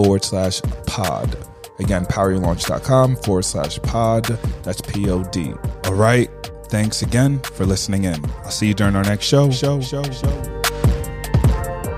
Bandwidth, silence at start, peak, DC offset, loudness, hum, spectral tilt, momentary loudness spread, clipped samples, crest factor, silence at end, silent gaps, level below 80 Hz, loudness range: 15.5 kHz; 0 s; -2 dBFS; under 0.1%; -19 LUFS; none; -5.5 dB/octave; 9 LU; under 0.1%; 18 dB; 0 s; none; -30 dBFS; 2 LU